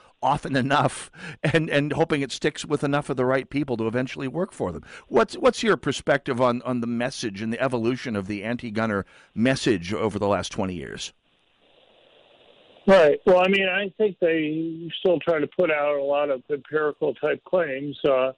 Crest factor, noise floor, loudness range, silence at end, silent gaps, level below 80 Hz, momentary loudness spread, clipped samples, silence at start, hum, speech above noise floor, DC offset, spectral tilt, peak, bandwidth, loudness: 14 dB; -64 dBFS; 5 LU; 0.05 s; none; -54 dBFS; 9 LU; under 0.1%; 0.2 s; none; 40 dB; under 0.1%; -5.5 dB/octave; -10 dBFS; 11 kHz; -24 LUFS